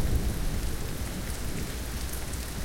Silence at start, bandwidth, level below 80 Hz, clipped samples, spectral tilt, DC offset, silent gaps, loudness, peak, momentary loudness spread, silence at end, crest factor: 0 s; 17 kHz; -34 dBFS; under 0.1%; -4.5 dB/octave; under 0.1%; none; -34 LUFS; -14 dBFS; 4 LU; 0 s; 16 dB